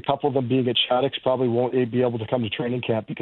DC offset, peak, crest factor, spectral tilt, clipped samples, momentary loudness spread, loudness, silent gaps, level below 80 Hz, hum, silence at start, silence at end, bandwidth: under 0.1%; -6 dBFS; 16 dB; -10 dB/octave; under 0.1%; 6 LU; -23 LUFS; none; -62 dBFS; none; 0.05 s; 0 s; 4.3 kHz